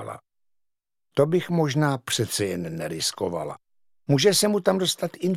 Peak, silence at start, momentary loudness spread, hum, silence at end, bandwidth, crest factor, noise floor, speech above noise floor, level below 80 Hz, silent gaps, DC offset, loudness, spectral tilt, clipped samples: -6 dBFS; 0 s; 16 LU; none; 0 s; 16.5 kHz; 20 dB; -77 dBFS; 54 dB; -64 dBFS; none; under 0.1%; -24 LUFS; -4.5 dB/octave; under 0.1%